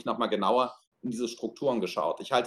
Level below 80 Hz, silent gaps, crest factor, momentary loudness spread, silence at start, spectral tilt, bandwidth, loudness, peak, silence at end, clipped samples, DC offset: -70 dBFS; 0.87-0.92 s; 18 dB; 8 LU; 0.05 s; -4.5 dB/octave; 12.5 kHz; -30 LUFS; -10 dBFS; 0 s; under 0.1%; under 0.1%